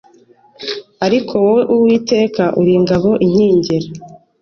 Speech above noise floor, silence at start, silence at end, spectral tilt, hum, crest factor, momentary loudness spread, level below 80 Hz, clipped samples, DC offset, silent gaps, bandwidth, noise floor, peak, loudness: 35 dB; 0.6 s; 0.25 s; -7 dB/octave; none; 12 dB; 13 LU; -48 dBFS; under 0.1%; under 0.1%; none; 6.8 kHz; -48 dBFS; -2 dBFS; -14 LUFS